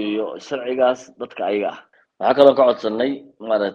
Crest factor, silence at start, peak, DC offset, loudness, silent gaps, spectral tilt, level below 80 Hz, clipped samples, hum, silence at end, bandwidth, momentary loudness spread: 20 dB; 0 s; 0 dBFS; under 0.1%; -19 LUFS; none; -5.5 dB/octave; -66 dBFS; under 0.1%; none; 0 s; 7.4 kHz; 15 LU